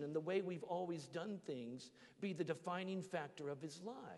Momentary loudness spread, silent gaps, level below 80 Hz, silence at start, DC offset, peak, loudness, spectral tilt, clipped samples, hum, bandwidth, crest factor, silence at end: 9 LU; none; -90 dBFS; 0 s; under 0.1%; -28 dBFS; -46 LUFS; -6 dB/octave; under 0.1%; none; 11.5 kHz; 18 dB; 0 s